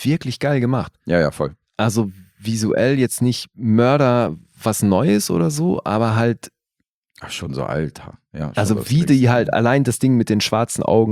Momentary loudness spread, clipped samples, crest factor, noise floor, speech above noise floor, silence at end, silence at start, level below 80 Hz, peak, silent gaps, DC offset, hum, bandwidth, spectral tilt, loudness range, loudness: 11 LU; under 0.1%; 16 dB; -77 dBFS; 59 dB; 0 s; 0 s; -50 dBFS; -2 dBFS; 6.90-7.03 s; under 0.1%; none; 16 kHz; -6 dB/octave; 5 LU; -18 LUFS